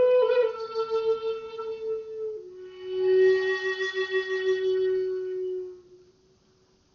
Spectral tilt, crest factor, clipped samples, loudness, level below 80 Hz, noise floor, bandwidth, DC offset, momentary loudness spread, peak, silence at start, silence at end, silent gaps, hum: -1.5 dB/octave; 14 dB; under 0.1%; -27 LUFS; -68 dBFS; -63 dBFS; 6.8 kHz; under 0.1%; 14 LU; -14 dBFS; 0 s; 1 s; none; none